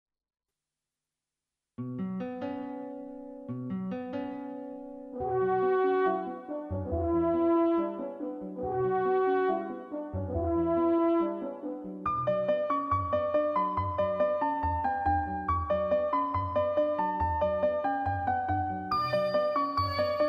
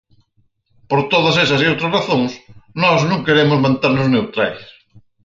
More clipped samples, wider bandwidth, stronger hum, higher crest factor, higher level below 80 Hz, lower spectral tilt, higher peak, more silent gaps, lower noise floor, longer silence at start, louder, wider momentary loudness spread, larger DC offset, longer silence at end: neither; second, 5.8 kHz vs 7.6 kHz; neither; about the same, 14 dB vs 16 dB; about the same, -50 dBFS vs -54 dBFS; first, -9 dB/octave vs -6 dB/octave; second, -16 dBFS vs -2 dBFS; neither; first, -90 dBFS vs -61 dBFS; first, 1.8 s vs 0.9 s; second, -30 LUFS vs -15 LUFS; first, 12 LU vs 7 LU; neither; second, 0 s vs 0.6 s